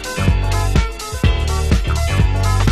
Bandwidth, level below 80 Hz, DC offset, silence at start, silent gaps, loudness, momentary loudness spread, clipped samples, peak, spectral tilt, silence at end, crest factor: 14 kHz; -18 dBFS; under 0.1%; 0 s; none; -18 LUFS; 3 LU; under 0.1%; -2 dBFS; -5.5 dB/octave; 0 s; 14 dB